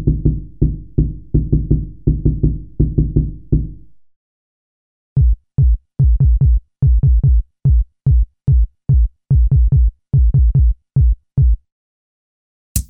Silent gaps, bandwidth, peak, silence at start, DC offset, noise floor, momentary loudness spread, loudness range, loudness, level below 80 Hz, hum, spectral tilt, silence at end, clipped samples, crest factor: 4.16-5.16 s, 11.72-12.75 s; 13 kHz; 0 dBFS; 0 s; under 0.1%; -37 dBFS; 7 LU; 5 LU; -17 LUFS; -16 dBFS; none; -9 dB/octave; 0.05 s; under 0.1%; 14 dB